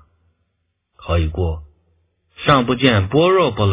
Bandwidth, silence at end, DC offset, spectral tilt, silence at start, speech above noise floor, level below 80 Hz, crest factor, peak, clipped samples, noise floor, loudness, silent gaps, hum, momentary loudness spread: 4 kHz; 0 s; under 0.1%; -10.5 dB/octave; 1 s; 56 dB; -30 dBFS; 18 dB; 0 dBFS; under 0.1%; -71 dBFS; -17 LUFS; none; none; 10 LU